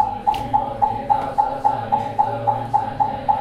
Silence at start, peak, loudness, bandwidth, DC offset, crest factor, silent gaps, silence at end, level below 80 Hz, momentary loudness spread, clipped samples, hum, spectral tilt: 0 s; -4 dBFS; -21 LUFS; 11.5 kHz; under 0.1%; 16 dB; none; 0 s; -44 dBFS; 3 LU; under 0.1%; none; -7 dB/octave